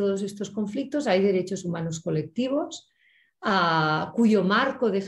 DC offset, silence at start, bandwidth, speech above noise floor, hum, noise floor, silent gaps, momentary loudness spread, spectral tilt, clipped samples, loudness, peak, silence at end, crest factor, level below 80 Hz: under 0.1%; 0 s; 11.5 kHz; 39 dB; none; -64 dBFS; none; 10 LU; -5.5 dB/octave; under 0.1%; -25 LUFS; -8 dBFS; 0 s; 16 dB; -66 dBFS